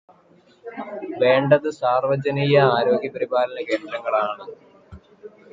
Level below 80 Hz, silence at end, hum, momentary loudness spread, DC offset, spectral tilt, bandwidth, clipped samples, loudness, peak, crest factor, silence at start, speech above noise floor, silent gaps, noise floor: -60 dBFS; 0.25 s; none; 18 LU; under 0.1%; -7 dB/octave; 7.6 kHz; under 0.1%; -20 LUFS; -4 dBFS; 18 dB; 0.65 s; 34 dB; none; -55 dBFS